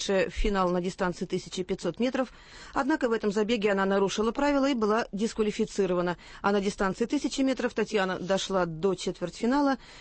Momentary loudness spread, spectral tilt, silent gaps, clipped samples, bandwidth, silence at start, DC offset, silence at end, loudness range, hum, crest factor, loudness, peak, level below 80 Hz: 7 LU; -5 dB/octave; none; under 0.1%; 8.8 kHz; 0 s; under 0.1%; 0 s; 2 LU; none; 16 dB; -28 LUFS; -12 dBFS; -44 dBFS